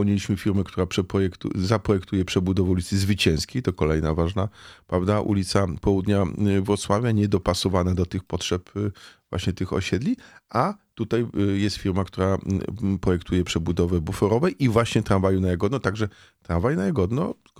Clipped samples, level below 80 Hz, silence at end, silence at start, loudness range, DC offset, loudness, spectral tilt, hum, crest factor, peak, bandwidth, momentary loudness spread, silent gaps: under 0.1%; -42 dBFS; 0.25 s; 0 s; 3 LU; under 0.1%; -24 LUFS; -6.5 dB/octave; none; 18 dB; -6 dBFS; 15 kHz; 6 LU; none